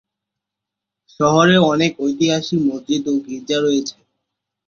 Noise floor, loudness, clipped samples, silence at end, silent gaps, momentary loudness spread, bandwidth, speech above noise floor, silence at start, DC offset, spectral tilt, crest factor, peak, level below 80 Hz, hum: -83 dBFS; -17 LUFS; under 0.1%; 0.75 s; none; 10 LU; 7.4 kHz; 67 dB; 1.2 s; under 0.1%; -5 dB/octave; 18 dB; -2 dBFS; -58 dBFS; none